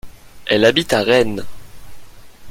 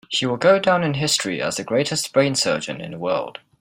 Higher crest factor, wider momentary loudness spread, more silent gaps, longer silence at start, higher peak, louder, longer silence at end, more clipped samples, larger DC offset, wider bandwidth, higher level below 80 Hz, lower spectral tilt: about the same, 18 dB vs 18 dB; first, 15 LU vs 9 LU; neither; about the same, 0.05 s vs 0.1 s; about the same, 0 dBFS vs -2 dBFS; first, -15 LUFS vs -20 LUFS; second, 0 s vs 0.3 s; neither; neither; about the same, 16.5 kHz vs 16.5 kHz; first, -44 dBFS vs -60 dBFS; about the same, -4.5 dB/octave vs -3.5 dB/octave